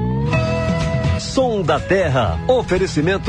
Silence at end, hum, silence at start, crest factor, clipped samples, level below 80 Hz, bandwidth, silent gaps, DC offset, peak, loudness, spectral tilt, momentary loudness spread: 0 s; none; 0 s; 12 dB; under 0.1%; -32 dBFS; 10.5 kHz; none; under 0.1%; -4 dBFS; -18 LUFS; -6 dB/octave; 2 LU